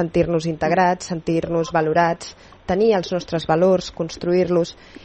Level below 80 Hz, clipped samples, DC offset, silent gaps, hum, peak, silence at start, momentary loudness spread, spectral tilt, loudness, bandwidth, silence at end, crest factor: -46 dBFS; under 0.1%; under 0.1%; none; none; -4 dBFS; 0 s; 9 LU; -6 dB/octave; -20 LUFS; 8.8 kHz; 0.05 s; 16 dB